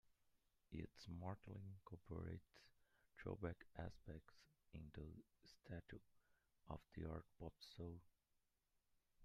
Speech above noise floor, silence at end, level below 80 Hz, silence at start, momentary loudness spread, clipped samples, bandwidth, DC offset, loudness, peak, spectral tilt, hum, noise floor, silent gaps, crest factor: 31 dB; 0 s; -70 dBFS; 0.05 s; 9 LU; under 0.1%; 13 kHz; under 0.1%; -57 LUFS; -34 dBFS; -7.5 dB/octave; none; -87 dBFS; none; 24 dB